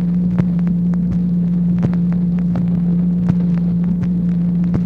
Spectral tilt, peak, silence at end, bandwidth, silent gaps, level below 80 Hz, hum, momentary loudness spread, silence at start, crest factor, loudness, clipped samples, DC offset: -11.5 dB/octave; -2 dBFS; 0 s; 2.7 kHz; none; -34 dBFS; none; 1 LU; 0 s; 14 dB; -17 LUFS; under 0.1%; 0.1%